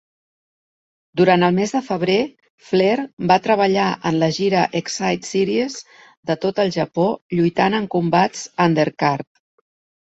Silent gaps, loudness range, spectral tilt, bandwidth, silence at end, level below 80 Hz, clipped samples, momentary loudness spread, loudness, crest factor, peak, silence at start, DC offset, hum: 2.50-2.58 s, 3.13-3.17 s, 6.17-6.23 s, 7.22-7.30 s; 3 LU; -5.5 dB/octave; 8.2 kHz; 0.85 s; -60 dBFS; under 0.1%; 7 LU; -19 LUFS; 18 dB; -2 dBFS; 1.15 s; under 0.1%; none